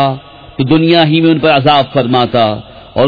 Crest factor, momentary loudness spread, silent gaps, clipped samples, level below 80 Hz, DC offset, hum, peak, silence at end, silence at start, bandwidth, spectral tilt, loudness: 10 dB; 14 LU; none; under 0.1%; -42 dBFS; under 0.1%; none; 0 dBFS; 0 s; 0 s; 5.4 kHz; -8.5 dB/octave; -10 LUFS